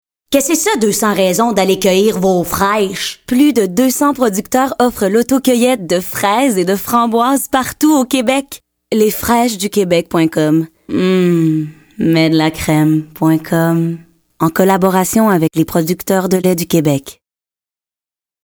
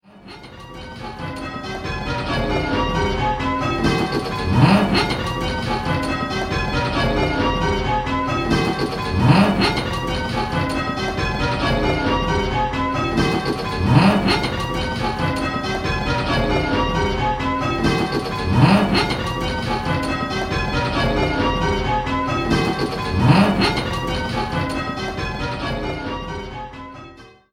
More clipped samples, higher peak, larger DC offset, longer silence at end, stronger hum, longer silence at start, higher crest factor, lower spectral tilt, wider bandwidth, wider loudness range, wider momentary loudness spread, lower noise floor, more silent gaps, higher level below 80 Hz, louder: neither; about the same, 0 dBFS vs 0 dBFS; neither; first, 1.35 s vs 0.25 s; neither; first, 0.3 s vs 0.15 s; second, 12 dB vs 20 dB; about the same, -5 dB/octave vs -6 dB/octave; first, over 20 kHz vs 15 kHz; about the same, 1 LU vs 3 LU; second, 5 LU vs 12 LU; first, under -90 dBFS vs -42 dBFS; neither; second, -46 dBFS vs -32 dBFS; first, -13 LUFS vs -20 LUFS